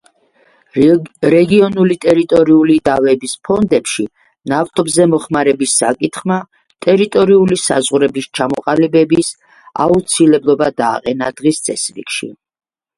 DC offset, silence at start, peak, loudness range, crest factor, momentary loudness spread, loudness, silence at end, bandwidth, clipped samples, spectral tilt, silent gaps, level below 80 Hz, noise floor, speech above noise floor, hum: under 0.1%; 0.75 s; 0 dBFS; 3 LU; 14 dB; 10 LU; -13 LUFS; 0.65 s; 11.5 kHz; under 0.1%; -5 dB/octave; none; -50 dBFS; -53 dBFS; 41 dB; none